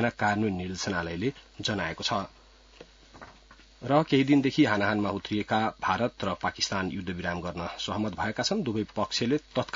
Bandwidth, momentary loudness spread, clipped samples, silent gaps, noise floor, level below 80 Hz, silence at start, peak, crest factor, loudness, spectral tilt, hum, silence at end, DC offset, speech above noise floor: 7.8 kHz; 9 LU; under 0.1%; none; -55 dBFS; -58 dBFS; 0 s; -8 dBFS; 20 dB; -28 LUFS; -5 dB/octave; none; 0.05 s; under 0.1%; 26 dB